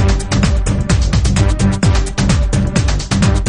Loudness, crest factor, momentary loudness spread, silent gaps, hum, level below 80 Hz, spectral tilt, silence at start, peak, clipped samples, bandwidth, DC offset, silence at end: -15 LUFS; 12 dB; 2 LU; none; none; -16 dBFS; -5.5 dB/octave; 0 s; 0 dBFS; under 0.1%; 11 kHz; under 0.1%; 0 s